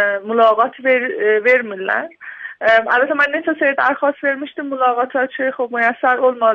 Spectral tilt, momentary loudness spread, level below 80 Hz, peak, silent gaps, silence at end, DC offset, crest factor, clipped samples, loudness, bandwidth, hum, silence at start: -5 dB/octave; 7 LU; -66 dBFS; -2 dBFS; none; 0 s; under 0.1%; 14 dB; under 0.1%; -16 LUFS; 6.6 kHz; none; 0 s